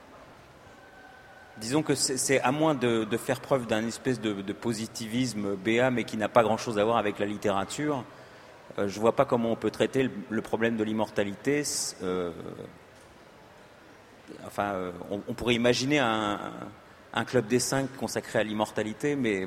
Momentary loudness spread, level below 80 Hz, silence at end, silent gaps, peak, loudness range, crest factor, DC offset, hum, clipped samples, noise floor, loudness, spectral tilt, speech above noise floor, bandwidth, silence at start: 12 LU; -60 dBFS; 0 s; none; -6 dBFS; 5 LU; 24 dB; under 0.1%; none; under 0.1%; -53 dBFS; -28 LUFS; -4.5 dB/octave; 25 dB; 16 kHz; 0 s